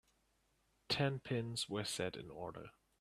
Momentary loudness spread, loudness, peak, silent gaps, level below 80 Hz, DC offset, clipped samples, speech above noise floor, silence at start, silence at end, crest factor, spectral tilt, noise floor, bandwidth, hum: 12 LU; -41 LUFS; -24 dBFS; none; -70 dBFS; under 0.1%; under 0.1%; 37 dB; 0.9 s; 0.3 s; 20 dB; -4.5 dB/octave; -78 dBFS; 15 kHz; none